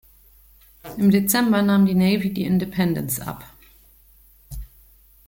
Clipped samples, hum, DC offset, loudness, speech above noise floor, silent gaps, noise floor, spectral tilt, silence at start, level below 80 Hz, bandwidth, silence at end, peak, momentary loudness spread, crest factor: under 0.1%; none; under 0.1%; -20 LUFS; 34 dB; none; -53 dBFS; -5.5 dB/octave; 0.85 s; -46 dBFS; 17 kHz; 0.65 s; -4 dBFS; 22 LU; 18 dB